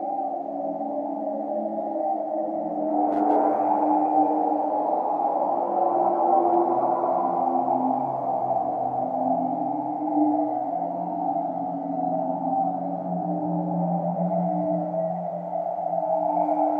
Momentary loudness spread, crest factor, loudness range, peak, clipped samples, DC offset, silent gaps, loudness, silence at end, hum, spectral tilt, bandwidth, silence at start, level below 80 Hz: 7 LU; 16 dB; 4 LU; -10 dBFS; under 0.1%; under 0.1%; none; -25 LUFS; 0 s; none; -11.5 dB/octave; 3.3 kHz; 0 s; -76 dBFS